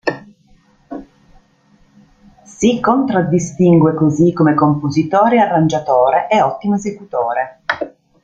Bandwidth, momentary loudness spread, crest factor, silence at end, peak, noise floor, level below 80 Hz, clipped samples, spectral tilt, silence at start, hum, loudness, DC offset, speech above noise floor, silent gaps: 8 kHz; 11 LU; 14 dB; 0.35 s; 0 dBFS; -53 dBFS; -52 dBFS; under 0.1%; -7 dB/octave; 0.05 s; none; -14 LUFS; under 0.1%; 39 dB; none